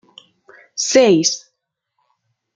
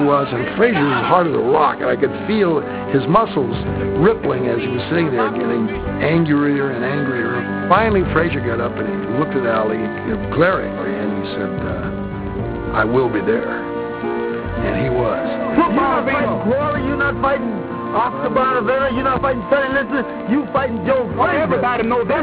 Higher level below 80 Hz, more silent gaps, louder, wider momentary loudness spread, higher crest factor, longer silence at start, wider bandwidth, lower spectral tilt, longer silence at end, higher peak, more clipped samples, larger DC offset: second, -66 dBFS vs -38 dBFS; neither; first, -15 LUFS vs -18 LUFS; first, 16 LU vs 7 LU; about the same, 18 dB vs 18 dB; first, 0.75 s vs 0 s; first, 9.4 kHz vs 4 kHz; second, -3 dB/octave vs -10.5 dB/octave; first, 1.2 s vs 0 s; about the same, -2 dBFS vs 0 dBFS; neither; neither